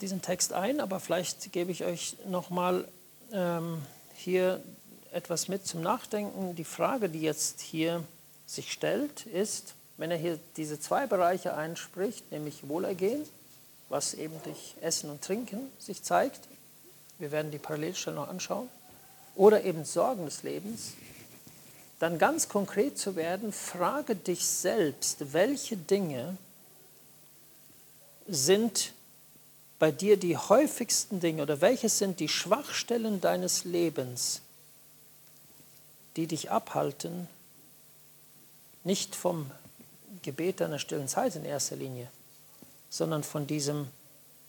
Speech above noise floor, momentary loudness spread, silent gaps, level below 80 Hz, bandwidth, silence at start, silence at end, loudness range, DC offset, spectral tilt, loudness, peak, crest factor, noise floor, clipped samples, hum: 26 dB; 16 LU; none; -76 dBFS; 19 kHz; 0 s; 0.55 s; 8 LU; under 0.1%; -4 dB/octave; -31 LUFS; -8 dBFS; 24 dB; -56 dBFS; under 0.1%; none